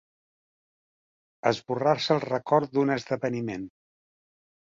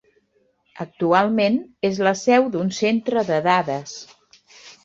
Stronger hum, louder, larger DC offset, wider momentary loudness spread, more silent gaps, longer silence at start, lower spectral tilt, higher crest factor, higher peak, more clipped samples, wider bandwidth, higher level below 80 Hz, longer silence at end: neither; second, -27 LUFS vs -20 LUFS; neither; second, 10 LU vs 15 LU; neither; first, 1.45 s vs 0.75 s; about the same, -6 dB/octave vs -5 dB/octave; about the same, 22 dB vs 18 dB; about the same, -6 dBFS vs -4 dBFS; neither; about the same, 7.6 kHz vs 7.8 kHz; about the same, -68 dBFS vs -64 dBFS; first, 1.1 s vs 0.15 s